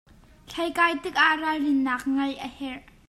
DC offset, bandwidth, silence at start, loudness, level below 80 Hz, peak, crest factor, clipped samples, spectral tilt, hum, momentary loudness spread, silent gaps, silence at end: under 0.1%; 13.5 kHz; 0.5 s; -24 LUFS; -58 dBFS; -6 dBFS; 20 dB; under 0.1%; -3 dB/octave; none; 15 LU; none; 0.3 s